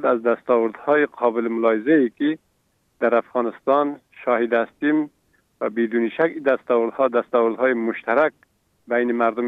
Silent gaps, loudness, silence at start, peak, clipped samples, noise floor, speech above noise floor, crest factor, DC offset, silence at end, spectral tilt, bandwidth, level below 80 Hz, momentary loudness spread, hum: none; -21 LUFS; 0 s; -4 dBFS; under 0.1%; -67 dBFS; 46 dB; 16 dB; under 0.1%; 0 s; -8 dB/octave; 4.3 kHz; -74 dBFS; 6 LU; none